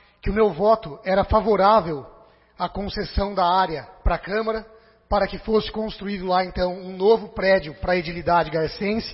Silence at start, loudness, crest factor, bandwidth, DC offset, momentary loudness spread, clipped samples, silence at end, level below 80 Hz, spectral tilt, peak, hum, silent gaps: 0.25 s; -22 LUFS; 18 dB; 5.8 kHz; under 0.1%; 10 LU; under 0.1%; 0 s; -36 dBFS; -9.5 dB/octave; -4 dBFS; none; none